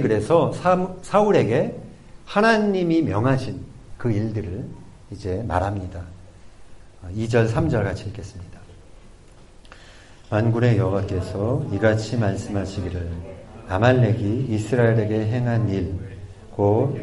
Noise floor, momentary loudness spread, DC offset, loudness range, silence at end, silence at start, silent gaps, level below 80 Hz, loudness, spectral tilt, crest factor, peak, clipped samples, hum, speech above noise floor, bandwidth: -46 dBFS; 19 LU; under 0.1%; 7 LU; 0 s; 0 s; none; -44 dBFS; -22 LUFS; -7.5 dB/octave; 18 dB; -4 dBFS; under 0.1%; none; 25 dB; 11.5 kHz